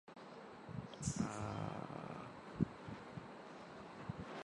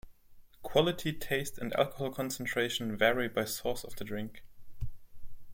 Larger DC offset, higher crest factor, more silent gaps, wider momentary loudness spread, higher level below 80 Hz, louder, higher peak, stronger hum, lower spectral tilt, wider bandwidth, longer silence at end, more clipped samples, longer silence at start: neither; about the same, 26 dB vs 22 dB; neither; second, 12 LU vs 17 LU; second, -66 dBFS vs -52 dBFS; second, -47 LUFS vs -33 LUFS; second, -20 dBFS vs -12 dBFS; neither; first, -5.5 dB/octave vs -4 dB/octave; second, 11 kHz vs 16.5 kHz; about the same, 0 s vs 0 s; neither; about the same, 0.05 s vs 0.05 s